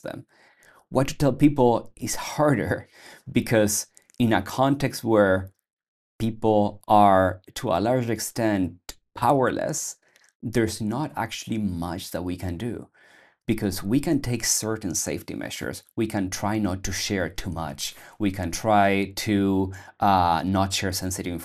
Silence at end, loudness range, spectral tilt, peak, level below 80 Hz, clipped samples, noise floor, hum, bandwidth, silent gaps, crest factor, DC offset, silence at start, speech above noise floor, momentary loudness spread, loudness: 0 s; 6 LU; -5 dB/octave; -4 dBFS; -48 dBFS; under 0.1%; -56 dBFS; none; 14.5 kHz; 5.73-5.77 s, 5.88-6.19 s, 10.35-10.40 s; 20 dB; under 0.1%; 0.05 s; 32 dB; 12 LU; -24 LUFS